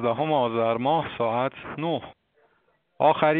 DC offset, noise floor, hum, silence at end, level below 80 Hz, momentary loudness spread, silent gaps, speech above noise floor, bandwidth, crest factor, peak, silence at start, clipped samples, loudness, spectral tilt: under 0.1%; -68 dBFS; none; 0 s; -64 dBFS; 7 LU; none; 44 dB; 4.3 kHz; 20 dB; -6 dBFS; 0 s; under 0.1%; -25 LUFS; -4.5 dB/octave